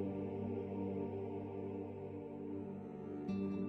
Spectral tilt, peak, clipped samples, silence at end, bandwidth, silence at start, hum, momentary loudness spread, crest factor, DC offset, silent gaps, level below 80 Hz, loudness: -10.5 dB/octave; -30 dBFS; under 0.1%; 0 s; 6 kHz; 0 s; none; 6 LU; 12 dB; under 0.1%; none; -74 dBFS; -44 LUFS